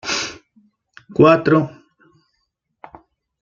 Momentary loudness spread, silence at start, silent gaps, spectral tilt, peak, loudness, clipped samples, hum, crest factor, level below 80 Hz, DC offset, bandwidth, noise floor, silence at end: 16 LU; 0.05 s; none; -5.5 dB/octave; -2 dBFS; -16 LUFS; under 0.1%; none; 20 dB; -56 dBFS; under 0.1%; 7.6 kHz; -72 dBFS; 1.75 s